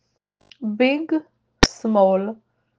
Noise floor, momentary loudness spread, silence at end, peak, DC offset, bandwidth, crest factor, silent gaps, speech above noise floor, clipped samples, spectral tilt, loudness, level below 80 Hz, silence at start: -64 dBFS; 14 LU; 0.45 s; 0 dBFS; under 0.1%; 9.8 kHz; 22 dB; none; 45 dB; under 0.1%; -4.5 dB/octave; -20 LUFS; -36 dBFS; 0.6 s